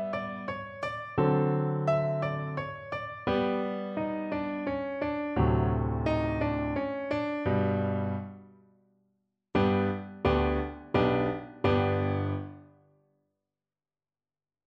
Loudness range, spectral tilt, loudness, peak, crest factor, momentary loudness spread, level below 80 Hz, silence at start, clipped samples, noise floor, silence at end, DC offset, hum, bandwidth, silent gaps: 3 LU; -9 dB/octave; -30 LUFS; -12 dBFS; 18 dB; 9 LU; -44 dBFS; 0 s; under 0.1%; under -90 dBFS; 2 s; under 0.1%; none; 7.8 kHz; none